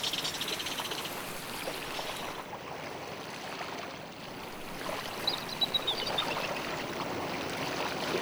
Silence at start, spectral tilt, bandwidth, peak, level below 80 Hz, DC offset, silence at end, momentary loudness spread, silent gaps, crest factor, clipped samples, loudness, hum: 0 s; -2.5 dB/octave; over 20 kHz; -18 dBFS; -60 dBFS; under 0.1%; 0 s; 10 LU; none; 18 dB; under 0.1%; -34 LUFS; none